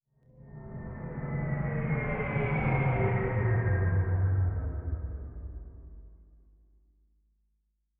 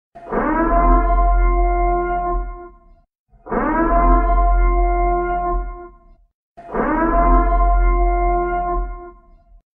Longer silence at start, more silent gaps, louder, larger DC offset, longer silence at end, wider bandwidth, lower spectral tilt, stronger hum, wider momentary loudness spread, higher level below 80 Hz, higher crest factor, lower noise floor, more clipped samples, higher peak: first, 0.4 s vs 0.15 s; second, none vs 3.19-3.26 s, 6.34-6.56 s; second, -30 LUFS vs -19 LUFS; neither; first, 1.75 s vs 0.65 s; first, 3.5 kHz vs 2.8 kHz; second, -9 dB/octave vs -12 dB/octave; neither; first, 17 LU vs 11 LU; second, -42 dBFS vs -20 dBFS; about the same, 14 dB vs 14 dB; first, -77 dBFS vs -49 dBFS; neither; second, -16 dBFS vs -2 dBFS